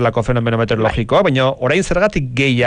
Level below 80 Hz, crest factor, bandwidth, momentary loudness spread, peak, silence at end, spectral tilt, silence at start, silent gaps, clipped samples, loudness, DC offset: -32 dBFS; 12 dB; 10 kHz; 3 LU; -4 dBFS; 0 s; -6 dB/octave; 0 s; none; under 0.1%; -16 LUFS; under 0.1%